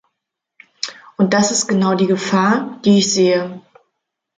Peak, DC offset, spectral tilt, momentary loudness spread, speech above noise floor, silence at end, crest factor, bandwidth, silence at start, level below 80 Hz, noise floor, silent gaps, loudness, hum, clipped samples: -2 dBFS; under 0.1%; -4.5 dB/octave; 14 LU; 63 dB; 0.75 s; 16 dB; 9.6 kHz; 0.85 s; -62 dBFS; -79 dBFS; none; -15 LUFS; none; under 0.1%